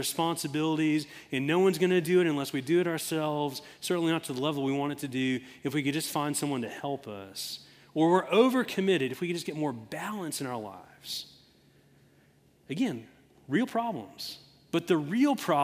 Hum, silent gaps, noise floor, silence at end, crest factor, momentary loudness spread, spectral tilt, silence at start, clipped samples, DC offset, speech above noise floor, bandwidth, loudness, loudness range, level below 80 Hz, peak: none; none; -63 dBFS; 0 s; 20 dB; 13 LU; -5 dB/octave; 0 s; under 0.1%; under 0.1%; 34 dB; 16 kHz; -30 LUFS; 9 LU; -74 dBFS; -10 dBFS